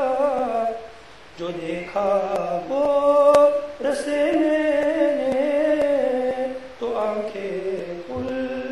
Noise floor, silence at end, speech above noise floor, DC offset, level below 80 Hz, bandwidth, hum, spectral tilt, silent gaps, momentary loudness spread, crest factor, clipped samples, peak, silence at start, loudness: -44 dBFS; 0 s; 23 dB; 0.4%; -54 dBFS; 11.5 kHz; none; -5.5 dB/octave; none; 13 LU; 18 dB; under 0.1%; -4 dBFS; 0 s; -22 LUFS